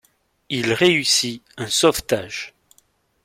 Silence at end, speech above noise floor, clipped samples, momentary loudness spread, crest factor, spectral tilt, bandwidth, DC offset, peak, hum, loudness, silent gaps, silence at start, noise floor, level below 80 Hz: 0.75 s; 41 dB; under 0.1%; 15 LU; 20 dB; -3 dB/octave; 16.5 kHz; under 0.1%; -2 dBFS; none; -19 LUFS; none; 0.5 s; -61 dBFS; -52 dBFS